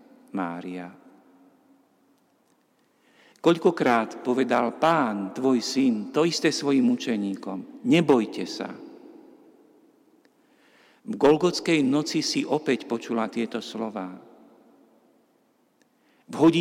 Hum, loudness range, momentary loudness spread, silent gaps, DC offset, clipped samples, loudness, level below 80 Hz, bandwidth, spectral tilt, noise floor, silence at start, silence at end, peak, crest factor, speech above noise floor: none; 9 LU; 15 LU; none; under 0.1%; under 0.1%; -24 LUFS; -72 dBFS; 15 kHz; -5 dB/octave; -66 dBFS; 0.35 s; 0 s; -10 dBFS; 16 dB; 42 dB